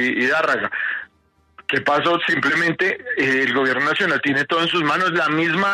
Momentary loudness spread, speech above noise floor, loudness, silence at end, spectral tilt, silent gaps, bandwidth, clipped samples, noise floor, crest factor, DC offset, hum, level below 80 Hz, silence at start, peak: 5 LU; 41 dB; -18 LUFS; 0 s; -4.5 dB/octave; none; 13.5 kHz; under 0.1%; -60 dBFS; 12 dB; under 0.1%; none; -64 dBFS; 0 s; -6 dBFS